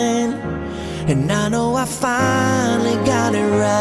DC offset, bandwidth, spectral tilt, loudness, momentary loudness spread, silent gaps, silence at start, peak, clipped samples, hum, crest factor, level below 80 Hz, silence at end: under 0.1%; 12 kHz; -5 dB/octave; -18 LUFS; 8 LU; none; 0 s; -4 dBFS; under 0.1%; none; 14 dB; -42 dBFS; 0 s